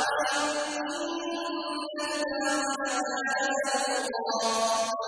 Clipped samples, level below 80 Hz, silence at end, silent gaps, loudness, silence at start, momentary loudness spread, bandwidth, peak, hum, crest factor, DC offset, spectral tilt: under 0.1%; -70 dBFS; 0 s; none; -29 LUFS; 0 s; 6 LU; 11 kHz; -14 dBFS; none; 14 dB; under 0.1%; -0.5 dB/octave